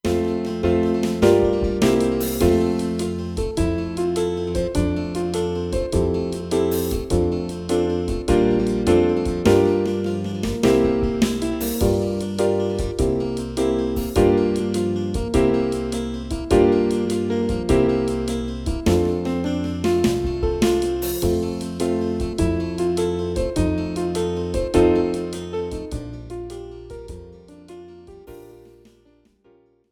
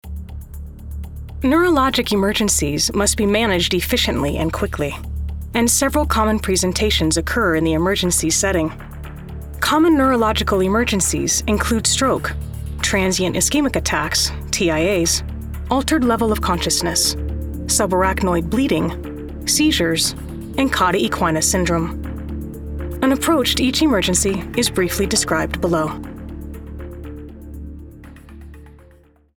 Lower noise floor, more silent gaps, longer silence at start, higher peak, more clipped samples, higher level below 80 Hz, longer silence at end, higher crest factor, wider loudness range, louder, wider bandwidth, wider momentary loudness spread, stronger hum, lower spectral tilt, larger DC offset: first, -57 dBFS vs -50 dBFS; neither; about the same, 0.05 s vs 0.05 s; about the same, -2 dBFS vs -2 dBFS; neither; about the same, -32 dBFS vs -30 dBFS; first, 1.35 s vs 0.6 s; about the same, 18 dB vs 16 dB; about the same, 4 LU vs 3 LU; second, -21 LUFS vs -18 LUFS; about the same, 19.5 kHz vs over 20 kHz; second, 9 LU vs 17 LU; neither; first, -6.5 dB/octave vs -3.5 dB/octave; neither